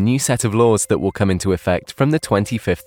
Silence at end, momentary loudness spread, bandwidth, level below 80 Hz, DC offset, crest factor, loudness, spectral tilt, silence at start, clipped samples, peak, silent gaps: 0.05 s; 4 LU; 18 kHz; -42 dBFS; under 0.1%; 14 dB; -18 LUFS; -5.5 dB/octave; 0 s; under 0.1%; -2 dBFS; none